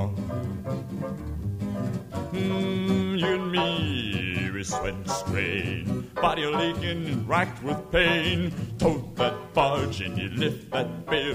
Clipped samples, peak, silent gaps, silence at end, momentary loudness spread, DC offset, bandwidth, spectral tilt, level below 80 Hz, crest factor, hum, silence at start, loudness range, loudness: under 0.1%; -8 dBFS; none; 0 s; 8 LU; under 0.1%; 15.5 kHz; -5.5 dB/octave; -46 dBFS; 20 dB; none; 0 s; 2 LU; -27 LUFS